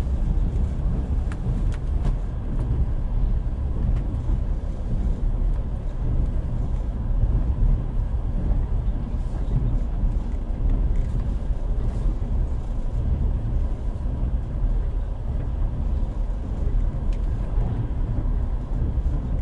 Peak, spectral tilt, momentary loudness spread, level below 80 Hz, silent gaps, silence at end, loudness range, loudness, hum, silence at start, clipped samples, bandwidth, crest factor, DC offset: -10 dBFS; -9.5 dB/octave; 4 LU; -24 dBFS; none; 0 s; 2 LU; -27 LUFS; none; 0 s; under 0.1%; 3.7 kHz; 12 dB; under 0.1%